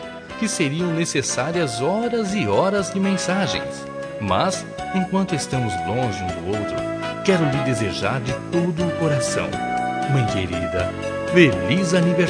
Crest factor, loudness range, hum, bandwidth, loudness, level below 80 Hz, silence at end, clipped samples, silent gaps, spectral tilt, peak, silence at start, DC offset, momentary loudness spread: 20 dB; 3 LU; none; 10.5 kHz; -21 LUFS; -48 dBFS; 0 s; under 0.1%; none; -5 dB/octave; 0 dBFS; 0 s; under 0.1%; 7 LU